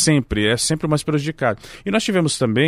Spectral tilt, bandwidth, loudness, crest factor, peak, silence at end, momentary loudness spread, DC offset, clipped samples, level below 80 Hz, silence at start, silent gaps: -4.5 dB/octave; 15.5 kHz; -20 LUFS; 16 dB; -2 dBFS; 0 s; 5 LU; under 0.1%; under 0.1%; -40 dBFS; 0 s; none